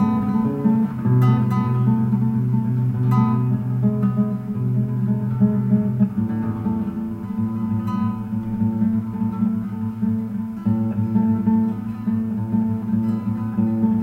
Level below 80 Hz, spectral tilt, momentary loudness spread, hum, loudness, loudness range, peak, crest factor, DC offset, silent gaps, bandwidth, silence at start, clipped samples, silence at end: -50 dBFS; -11 dB/octave; 6 LU; none; -21 LUFS; 4 LU; -6 dBFS; 14 dB; under 0.1%; none; 4.3 kHz; 0 s; under 0.1%; 0 s